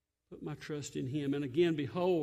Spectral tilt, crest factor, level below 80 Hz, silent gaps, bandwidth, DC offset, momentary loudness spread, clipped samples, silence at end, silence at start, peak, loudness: -6.5 dB/octave; 14 dB; -70 dBFS; none; 13.5 kHz; under 0.1%; 13 LU; under 0.1%; 0 s; 0.3 s; -20 dBFS; -35 LUFS